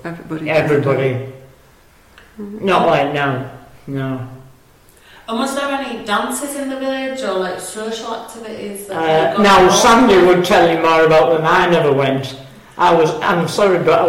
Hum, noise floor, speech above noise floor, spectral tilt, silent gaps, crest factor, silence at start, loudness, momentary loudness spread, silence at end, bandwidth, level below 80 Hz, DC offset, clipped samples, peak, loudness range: none; -48 dBFS; 33 dB; -4.5 dB/octave; none; 14 dB; 0.05 s; -14 LUFS; 18 LU; 0 s; 16.5 kHz; -46 dBFS; under 0.1%; under 0.1%; 0 dBFS; 11 LU